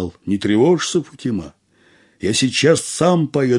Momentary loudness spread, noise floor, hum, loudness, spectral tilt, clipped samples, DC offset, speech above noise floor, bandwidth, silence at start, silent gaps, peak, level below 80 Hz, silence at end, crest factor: 10 LU; -54 dBFS; none; -17 LUFS; -5 dB/octave; under 0.1%; under 0.1%; 37 dB; 11.5 kHz; 0 s; none; 0 dBFS; -56 dBFS; 0 s; 18 dB